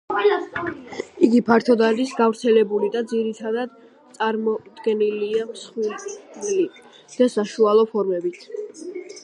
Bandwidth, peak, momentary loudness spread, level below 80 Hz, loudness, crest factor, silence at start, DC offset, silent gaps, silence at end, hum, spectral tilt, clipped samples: 11 kHz; -2 dBFS; 16 LU; -66 dBFS; -21 LUFS; 20 dB; 0.1 s; under 0.1%; none; 0.05 s; none; -5 dB/octave; under 0.1%